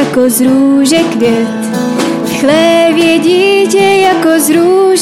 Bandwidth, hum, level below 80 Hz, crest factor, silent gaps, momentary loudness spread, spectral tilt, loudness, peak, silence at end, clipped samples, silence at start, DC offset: 16 kHz; none; -50 dBFS; 8 dB; none; 6 LU; -4 dB/octave; -8 LUFS; 0 dBFS; 0 s; under 0.1%; 0 s; 0.3%